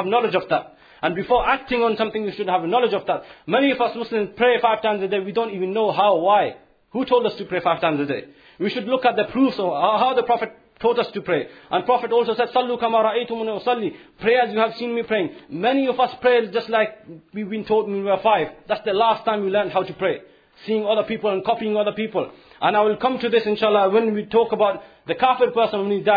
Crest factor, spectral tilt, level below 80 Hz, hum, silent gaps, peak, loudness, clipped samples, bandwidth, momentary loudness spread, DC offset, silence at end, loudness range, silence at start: 16 dB; -7.5 dB/octave; -56 dBFS; none; none; -4 dBFS; -21 LUFS; under 0.1%; 5 kHz; 8 LU; under 0.1%; 0 s; 2 LU; 0 s